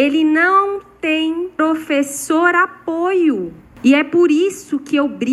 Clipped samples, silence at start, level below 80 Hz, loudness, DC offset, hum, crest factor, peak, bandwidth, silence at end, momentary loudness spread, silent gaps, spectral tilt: under 0.1%; 0 s; -58 dBFS; -16 LUFS; under 0.1%; none; 14 dB; 0 dBFS; 13 kHz; 0 s; 8 LU; none; -3.5 dB/octave